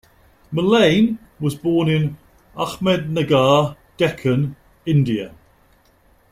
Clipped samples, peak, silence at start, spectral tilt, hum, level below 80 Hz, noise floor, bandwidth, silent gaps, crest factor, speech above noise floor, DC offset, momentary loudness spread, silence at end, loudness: under 0.1%; -2 dBFS; 0.5 s; -6.5 dB/octave; none; -50 dBFS; -56 dBFS; 15.5 kHz; none; 18 dB; 38 dB; under 0.1%; 12 LU; 1 s; -19 LUFS